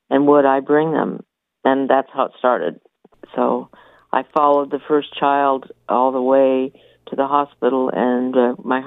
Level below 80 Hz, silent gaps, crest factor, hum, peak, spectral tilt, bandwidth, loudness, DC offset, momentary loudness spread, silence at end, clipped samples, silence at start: -70 dBFS; none; 16 dB; none; -2 dBFS; -8.5 dB/octave; 4 kHz; -18 LUFS; under 0.1%; 9 LU; 0 s; under 0.1%; 0.1 s